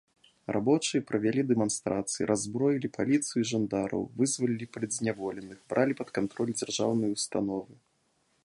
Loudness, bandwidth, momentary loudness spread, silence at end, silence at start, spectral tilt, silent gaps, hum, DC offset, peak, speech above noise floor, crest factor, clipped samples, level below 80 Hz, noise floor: -30 LUFS; 11.5 kHz; 7 LU; 0.7 s; 0.5 s; -4.5 dB/octave; none; none; under 0.1%; -12 dBFS; 43 dB; 18 dB; under 0.1%; -66 dBFS; -72 dBFS